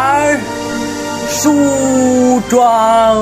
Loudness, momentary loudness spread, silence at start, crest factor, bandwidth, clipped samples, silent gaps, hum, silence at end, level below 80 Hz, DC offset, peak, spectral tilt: -12 LUFS; 9 LU; 0 s; 12 dB; 16 kHz; under 0.1%; none; none; 0 s; -42 dBFS; 0.2%; 0 dBFS; -4 dB/octave